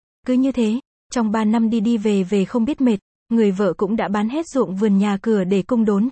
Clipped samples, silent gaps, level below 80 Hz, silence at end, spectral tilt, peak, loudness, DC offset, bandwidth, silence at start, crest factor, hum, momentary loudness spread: under 0.1%; 0.85-1.10 s, 3.02-3.26 s; -54 dBFS; 0 s; -7 dB/octave; -6 dBFS; -19 LUFS; under 0.1%; 8.6 kHz; 0.25 s; 12 dB; none; 4 LU